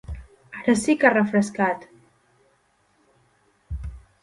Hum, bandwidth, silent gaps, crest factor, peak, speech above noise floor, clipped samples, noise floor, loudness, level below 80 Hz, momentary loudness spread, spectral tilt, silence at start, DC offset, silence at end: none; 11.5 kHz; none; 24 dB; -2 dBFS; 45 dB; under 0.1%; -65 dBFS; -21 LUFS; -42 dBFS; 22 LU; -5.5 dB/octave; 0.1 s; under 0.1%; 0.25 s